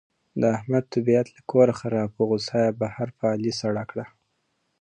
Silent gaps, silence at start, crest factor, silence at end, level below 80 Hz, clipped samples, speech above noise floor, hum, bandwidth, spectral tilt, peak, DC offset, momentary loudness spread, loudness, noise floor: none; 0.35 s; 18 dB; 0.75 s; -62 dBFS; under 0.1%; 50 dB; none; 9.6 kHz; -6.5 dB/octave; -6 dBFS; under 0.1%; 10 LU; -24 LUFS; -73 dBFS